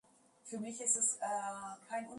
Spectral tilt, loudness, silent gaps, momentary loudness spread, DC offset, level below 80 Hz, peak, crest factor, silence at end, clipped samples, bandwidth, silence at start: -2 dB/octave; -36 LUFS; none; 16 LU; under 0.1%; -86 dBFS; -20 dBFS; 18 dB; 0 s; under 0.1%; 11.5 kHz; 0.45 s